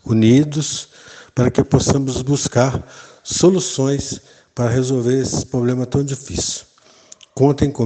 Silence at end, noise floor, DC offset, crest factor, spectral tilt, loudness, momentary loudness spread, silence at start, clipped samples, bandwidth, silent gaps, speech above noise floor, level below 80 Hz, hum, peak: 0 s; -47 dBFS; under 0.1%; 18 dB; -5.5 dB/octave; -18 LUFS; 14 LU; 0.05 s; under 0.1%; 9.2 kHz; none; 30 dB; -40 dBFS; none; 0 dBFS